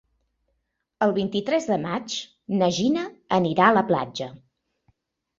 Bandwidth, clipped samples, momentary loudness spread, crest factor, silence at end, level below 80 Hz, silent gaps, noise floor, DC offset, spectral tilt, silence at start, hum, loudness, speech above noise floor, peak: 7.8 kHz; under 0.1%; 13 LU; 22 dB; 1.05 s; -62 dBFS; none; -76 dBFS; under 0.1%; -5.5 dB/octave; 1 s; none; -23 LUFS; 53 dB; -2 dBFS